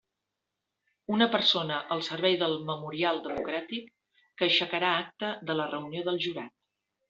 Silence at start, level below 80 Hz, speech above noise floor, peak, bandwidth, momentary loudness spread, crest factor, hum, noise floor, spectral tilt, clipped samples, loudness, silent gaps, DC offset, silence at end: 1.1 s; -72 dBFS; 56 dB; -10 dBFS; 7.8 kHz; 10 LU; 20 dB; none; -86 dBFS; -1.5 dB/octave; under 0.1%; -29 LUFS; none; under 0.1%; 0.6 s